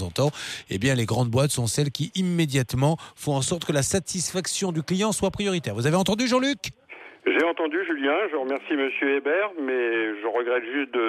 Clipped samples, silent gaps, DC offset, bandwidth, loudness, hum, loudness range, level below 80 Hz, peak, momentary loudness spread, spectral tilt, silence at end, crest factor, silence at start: under 0.1%; none; under 0.1%; 15.5 kHz; -25 LUFS; none; 1 LU; -54 dBFS; -10 dBFS; 4 LU; -4.5 dB/octave; 0 s; 14 dB; 0 s